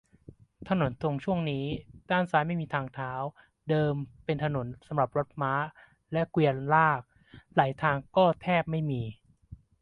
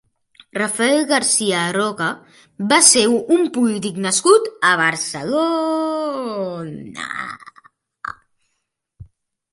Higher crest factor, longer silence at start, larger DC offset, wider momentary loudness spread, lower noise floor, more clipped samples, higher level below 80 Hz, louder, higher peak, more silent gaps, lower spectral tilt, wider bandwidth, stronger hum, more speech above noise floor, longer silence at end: about the same, 22 dB vs 20 dB; about the same, 0.6 s vs 0.55 s; neither; second, 11 LU vs 18 LU; second, -54 dBFS vs -74 dBFS; neither; about the same, -58 dBFS vs -60 dBFS; second, -29 LUFS vs -17 LUFS; second, -8 dBFS vs 0 dBFS; neither; first, -8.5 dB/octave vs -2.5 dB/octave; second, 6 kHz vs 15.5 kHz; neither; second, 26 dB vs 56 dB; second, 0.25 s vs 0.5 s